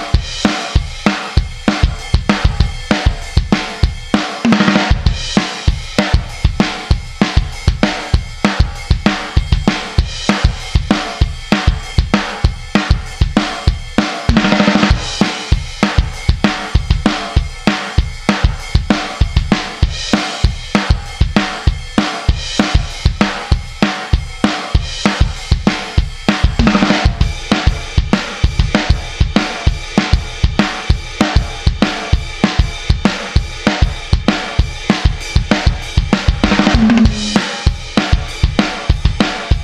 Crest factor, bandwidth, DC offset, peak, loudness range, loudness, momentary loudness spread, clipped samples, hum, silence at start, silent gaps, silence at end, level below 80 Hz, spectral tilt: 14 dB; 12 kHz; 0.3%; 0 dBFS; 2 LU; -15 LUFS; 6 LU; under 0.1%; none; 0 s; none; 0 s; -18 dBFS; -5.5 dB/octave